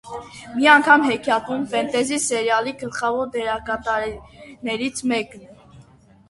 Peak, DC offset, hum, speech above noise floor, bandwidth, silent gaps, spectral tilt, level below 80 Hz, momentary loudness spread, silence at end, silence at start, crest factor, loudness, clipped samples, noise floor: 0 dBFS; under 0.1%; none; 29 dB; 12 kHz; none; -2.5 dB/octave; -54 dBFS; 17 LU; 0.5 s; 0.05 s; 22 dB; -20 LUFS; under 0.1%; -50 dBFS